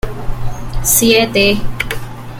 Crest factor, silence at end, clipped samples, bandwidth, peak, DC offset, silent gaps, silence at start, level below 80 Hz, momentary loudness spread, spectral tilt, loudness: 14 dB; 0 s; under 0.1%; 17 kHz; 0 dBFS; under 0.1%; none; 0.05 s; -24 dBFS; 16 LU; -3 dB/octave; -12 LUFS